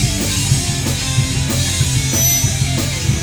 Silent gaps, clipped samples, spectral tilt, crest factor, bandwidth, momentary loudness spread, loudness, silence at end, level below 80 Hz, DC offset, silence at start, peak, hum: none; under 0.1%; -3 dB/octave; 16 dB; over 20 kHz; 5 LU; -15 LUFS; 0 s; -28 dBFS; under 0.1%; 0 s; 0 dBFS; none